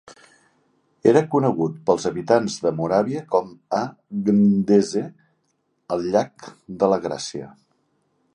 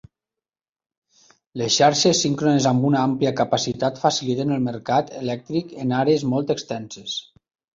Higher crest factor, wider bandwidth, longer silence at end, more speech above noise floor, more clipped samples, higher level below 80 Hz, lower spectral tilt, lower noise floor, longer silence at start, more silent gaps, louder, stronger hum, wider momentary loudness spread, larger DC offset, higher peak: about the same, 20 dB vs 18 dB; first, 10 kHz vs 7.8 kHz; first, 0.85 s vs 0.55 s; second, 49 dB vs over 69 dB; neither; about the same, -60 dBFS vs -60 dBFS; first, -6.5 dB/octave vs -4.5 dB/octave; second, -70 dBFS vs under -90 dBFS; second, 0.05 s vs 1.55 s; neither; about the same, -21 LUFS vs -21 LUFS; neither; about the same, 12 LU vs 12 LU; neither; about the same, -2 dBFS vs -4 dBFS